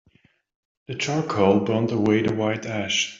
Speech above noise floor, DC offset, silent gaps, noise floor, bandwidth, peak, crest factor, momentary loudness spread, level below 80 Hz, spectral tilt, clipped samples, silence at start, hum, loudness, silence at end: 39 dB; under 0.1%; none; -61 dBFS; 7.8 kHz; -6 dBFS; 18 dB; 8 LU; -60 dBFS; -5 dB/octave; under 0.1%; 0.9 s; none; -22 LUFS; 0 s